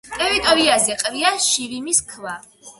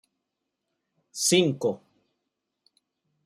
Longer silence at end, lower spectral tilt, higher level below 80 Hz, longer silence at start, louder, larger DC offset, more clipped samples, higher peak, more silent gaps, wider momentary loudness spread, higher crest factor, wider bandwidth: second, 0.1 s vs 1.5 s; second, -0.5 dB/octave vs -3.5 dB/octave; first, -50 dBFS vs -74 dBFS; second, 0.05 s vs 1.15 s; first, -17 LUFS vs -24 LUFS; neither; neither; first, -2 dBFS vs -8 dBFS; neither; second, 17 LU vs 20 LU; about the same, 18 dB vs 22 dB; about the same, 12 kHz vs 13 kHz